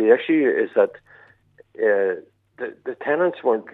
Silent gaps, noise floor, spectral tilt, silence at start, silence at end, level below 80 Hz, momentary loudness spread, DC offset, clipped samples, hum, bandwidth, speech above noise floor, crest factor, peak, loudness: none; -54 dBFS; -8 dB/octave; 0 s; 0.05 s; -76 dBFS; 15 LU; under 0.1%; under 0.1%; none; 4.1 kHz; 34 dB; 18 dB; -2 dBFS; -21 LUFS